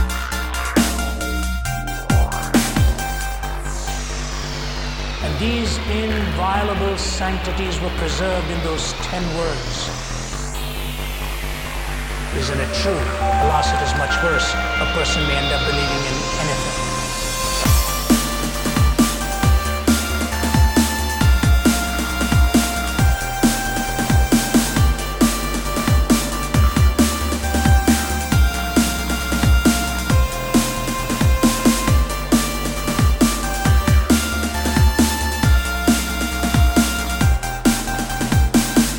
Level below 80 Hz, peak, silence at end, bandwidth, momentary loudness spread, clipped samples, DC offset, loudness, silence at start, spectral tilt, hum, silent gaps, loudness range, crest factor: -22 dBFS; -2 dBFS; 0 s; 17.5 kHz; 9 LU; under 0.1%; under 0.1%; -19 LUFS; 0 s; -4.5 dB/octave; none; none; 5 LU; 16 dB